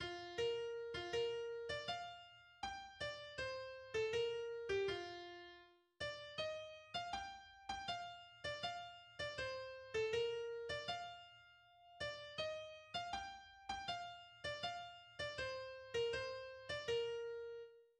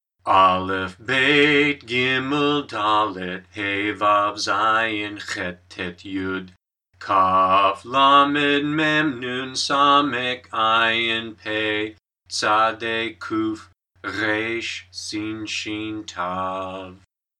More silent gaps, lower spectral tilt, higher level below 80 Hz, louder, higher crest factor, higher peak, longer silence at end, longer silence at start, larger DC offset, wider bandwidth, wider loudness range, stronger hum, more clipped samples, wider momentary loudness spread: neither; about the same, -3 dB/octave vs -3.5 dB/octave; second, -70 dBFS vs -64 dBFS; second, -46 LUFS vs -20 LUFS; about the same, 16 dB vs 20 dB; second, -30 dBFS vs -2 dBFS; second, 0.15 s vs 0.45 s; second, 0 s vs 0.25 s; neither; about the same, 10.5 kHz vs 11 kHz; second, 3 LU vs 8 LU; neither; neither; about the same, 12 LU vs 14 LU